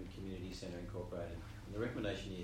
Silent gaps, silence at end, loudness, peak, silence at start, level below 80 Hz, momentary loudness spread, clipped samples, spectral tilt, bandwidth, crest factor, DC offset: none; 0 s; -45 LUFS; -28 dBFS; 0 s; -54 dBFS; 7 LU; under 0.1%; -6 dB/octave; 16 kHz; 16 dB; under 0.1%